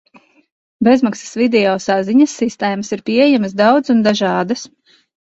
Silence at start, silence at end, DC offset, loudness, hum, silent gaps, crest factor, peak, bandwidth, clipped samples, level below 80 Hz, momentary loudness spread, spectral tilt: 0.8 s; 0.65 s; under 0.1%; -15 LUFS; none; none; 14 dB; 0 dBFS; 8 kHz; under 0.1%; -58 dBFS; 7 LU; -5 dB/octave